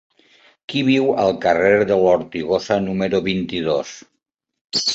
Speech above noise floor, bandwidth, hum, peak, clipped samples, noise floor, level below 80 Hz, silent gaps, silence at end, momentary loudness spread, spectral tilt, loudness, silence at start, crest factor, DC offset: 58 dB; 8.2 kHz; none; -2 dBFS; under 0.1%; -75 dBFS; -52 dBFS; 4.61-4.68 s; 0 s; 8 LU; -4.5 dB/octave; -18 LUFS; 0.7 s; 18 dB; under 0.1%